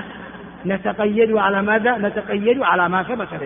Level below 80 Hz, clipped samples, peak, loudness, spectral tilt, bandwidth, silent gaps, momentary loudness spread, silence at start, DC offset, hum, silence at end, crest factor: -54 dBFS; under 0.1%; -4 dBFS; -18 LUFS; -4 dB/octave; 3.7 kHz; none; 13 LU; 0 s; under 0.1%; none; 0 s; 16 dB